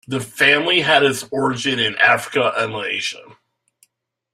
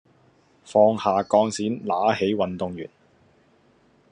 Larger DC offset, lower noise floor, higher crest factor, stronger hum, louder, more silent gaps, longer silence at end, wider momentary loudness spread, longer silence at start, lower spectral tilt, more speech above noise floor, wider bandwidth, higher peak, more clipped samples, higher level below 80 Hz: neither; first, -65 dBFS vs -60 dBFS; about the same, 18 dB vs 20 dB; neither; first, -17 LUFS vs -22 LUFS; neither; second, 1.1 s vs 1.25 s; second, 9 LU vs 12 LU; second, 0.1 s vs 0.65 s; second, -3 dB/octave vs -5.5 dB/octave; first, 46 dB vs 38 dB; first, 15.5 kHz vs 10.5 kHz; about the same, -2 dBFS vs -4 dBFS; neither; first, -62 dBFS vs -70 dBFS